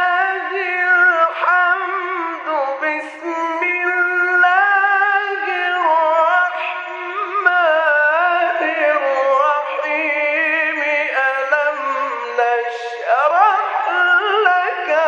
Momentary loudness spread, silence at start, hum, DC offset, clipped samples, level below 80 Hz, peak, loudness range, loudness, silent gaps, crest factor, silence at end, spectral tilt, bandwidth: 8 LU; 0 s; none; under 0.1%; under 0.1%; -80 dBFS; -2 dBFS; 2 LU; -16 LUFS; none; 16 dB; 0 s; -1 dB/octave; 8.6 kHz